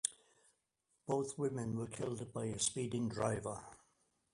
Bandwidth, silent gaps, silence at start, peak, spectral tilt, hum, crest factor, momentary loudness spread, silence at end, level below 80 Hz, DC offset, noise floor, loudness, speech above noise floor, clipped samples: 11.5 kHz; none; 0.05 s; -18 dBFS; -4.5 dB/octave; none; 24 dB; 10 LU; 0.6 s; -68 dBFS; under 0.1%; -83 dBFS; -40 LUFS; 43 dB; under 0.1%